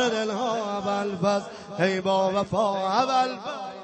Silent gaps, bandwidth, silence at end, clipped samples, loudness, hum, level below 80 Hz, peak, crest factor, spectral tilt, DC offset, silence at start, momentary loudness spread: none; 8.4 kHz; 0 s; under 0.1%; -25 LUFS; none; -64 dBFS; -8 dBFS; 16 dB; -5 dB/octave; under 0.1%; 0 s; 6 LU